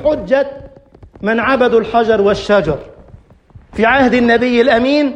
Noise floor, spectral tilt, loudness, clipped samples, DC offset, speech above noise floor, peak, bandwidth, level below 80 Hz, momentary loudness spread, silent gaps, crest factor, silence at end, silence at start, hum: -42 dBFS; -6 dB/octave; -13 LUFS; under 0.1%; under 0.1%; 30 dB; 0 dBFS; 9.2 kHz; -40 dBFS; 10 LU; none; 12 dB; 0 s; 0 s; none